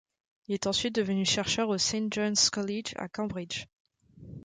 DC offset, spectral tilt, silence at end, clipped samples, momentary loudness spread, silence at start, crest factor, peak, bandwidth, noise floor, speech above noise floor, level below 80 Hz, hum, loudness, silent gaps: under 0.1%; -3 dB/octave; 0.05 s; under 0.1%; 12 LU; 0.5 s; 18 dB; -14 dBFS; 9.6 kHz; -50 dBFS; 20 dB; -60 dBFS; none; -29 LUFS; 3.73-3.85 s